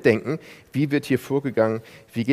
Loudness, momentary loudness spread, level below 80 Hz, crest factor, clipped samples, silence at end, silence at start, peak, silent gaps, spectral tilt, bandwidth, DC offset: -24 LUFS; 10 LU; -64 dBFS; 20 dB; under 0.1%; 0 s; 0 s; -2 dBFS; none; -7 dB/octave; 15.5 kHz; under 0.1%